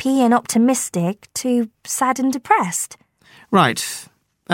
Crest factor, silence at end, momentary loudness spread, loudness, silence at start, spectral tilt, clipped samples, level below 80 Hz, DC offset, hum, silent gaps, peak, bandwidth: 18 dB; 0 s; 9 LU; -19 LUFS; 0 s; -4 dB/octave; under 0.1%; -66 dBFS; under 0.1%; none; none; 0 dBFS; 16.5 kHz